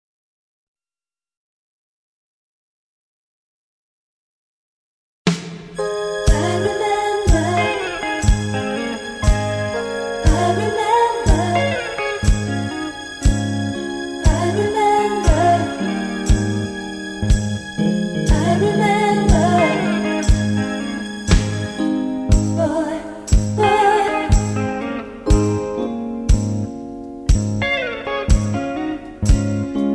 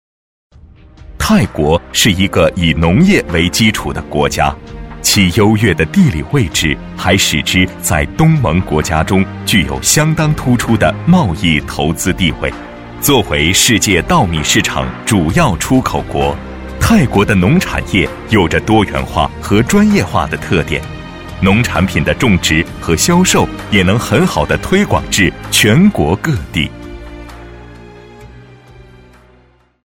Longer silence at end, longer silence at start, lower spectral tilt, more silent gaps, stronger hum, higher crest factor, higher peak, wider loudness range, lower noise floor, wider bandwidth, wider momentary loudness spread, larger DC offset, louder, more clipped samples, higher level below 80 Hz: second, 0 s vs 1.45 s; first, 5.25 s vs 1 s; about the same, -5.5 dB/octave vs -4.5 dB/octave; neither; neither; first, 18 dB vs 12 dB; about the same, -2 dBFS vs 0 dBFS; about the same, 4 LU vs 2 LU; first, under -90 dBFS vs -49 dBFS; second, 11 kHz vs 16.5 kHz; about the same, 9 LU vs 8 LU; neither; second, -19 LUFS vs -12 LUFS; neither; about the same, -24 dBFS vs -28 dBFS